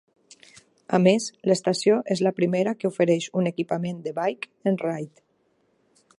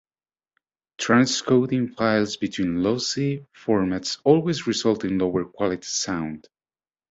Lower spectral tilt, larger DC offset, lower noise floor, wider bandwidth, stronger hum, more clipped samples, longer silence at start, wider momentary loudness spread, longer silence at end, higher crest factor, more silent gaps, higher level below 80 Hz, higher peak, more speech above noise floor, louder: first, -6 dB/octave vs -4.5 dB/octave; neither; second, -67 dBFS vs under -90 dBFS; first, 11.5 kHz vs 8 kHz; neither; neither; about the same, 0.9 s vs 1 s; about the same, 8 LU vs 8 LU; first, 1.1 s vs 0.7 s; about the same, 20 dB vs 20 dB; neither; second, -72 dBFS vs -56 dBFS; about the same, -6 dBFS vs -4 dBFS; second, 44 dB vs over 67 dB; about the same, -24 LUFS vs -23 LUFS